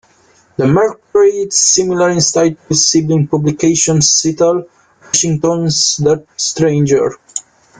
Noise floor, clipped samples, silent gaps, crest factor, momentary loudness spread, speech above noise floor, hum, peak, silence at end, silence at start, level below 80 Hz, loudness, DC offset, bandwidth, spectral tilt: -50 dBFS; under 0.1%; none; 14 dB; 7 LU; 38 dB; none; 0 dBFS; 0.4 s; 0.6 s; -48 dBFS; -12 LUFS; under 0.1%; 10 kHz; -4 dB/octave